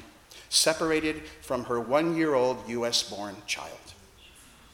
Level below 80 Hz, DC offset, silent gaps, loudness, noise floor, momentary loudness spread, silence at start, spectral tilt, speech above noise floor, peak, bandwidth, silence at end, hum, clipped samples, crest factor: -58 dBFS; under 0.1%; none; -27 LUFS; -53 dBFS; 13 LU; 0 s; -2.5 dB/octave; 25 dB; -10 dBFS; 18 kHz; 0.3 s; none; under 0.1%; 20 dB